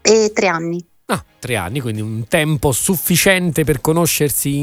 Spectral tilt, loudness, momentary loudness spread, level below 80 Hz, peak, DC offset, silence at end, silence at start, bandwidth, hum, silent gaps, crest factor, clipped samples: -4 dB/octave; -16 LUFS; 10 LU; -40 dBFS; 0 dBFS; under 0.1%; 0 s; 0.05 s; 17 kHz; none; none; 16 dB; under 0.1%